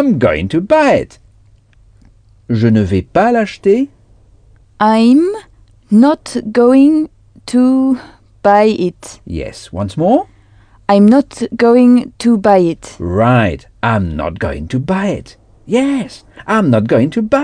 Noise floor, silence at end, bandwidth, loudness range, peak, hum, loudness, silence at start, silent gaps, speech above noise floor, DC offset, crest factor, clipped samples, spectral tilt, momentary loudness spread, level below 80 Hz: -47 dBFS; 0 s; 10 kHz; 4 LU; 0 dBFS; none; -12 LUFS; 0 s; none; 35 dB; under 0.1%; 12 dB; under 0.1%; -7.5 dB/octave; 15 LU; -38 dBFS